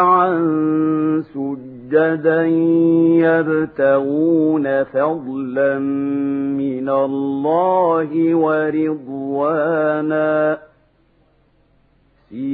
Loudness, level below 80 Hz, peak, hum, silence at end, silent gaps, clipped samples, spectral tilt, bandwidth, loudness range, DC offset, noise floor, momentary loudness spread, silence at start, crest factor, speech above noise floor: -17 LUFS; -64 dBFS; -2 dBFS; none; 0 s; none; under 0.1%; -12 dB/octave; 4 kHz; 4 LU; under 0.1%; -57 dBFS; 8 LU; 0 s; 16 dB; 41 dB